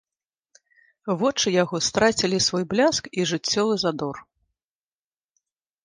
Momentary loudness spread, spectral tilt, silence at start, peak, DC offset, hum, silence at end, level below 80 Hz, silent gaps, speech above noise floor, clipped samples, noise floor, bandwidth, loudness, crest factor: 10 LU; -3.5 dB/octave; 1.05 s; -6 dBFS; under 0.1%; none; 1.6 s; -58 dBFS; none; over 67 dB; under 0.1%; under -90 dBFS; 11 kHz; -22 LUFS; 18 dB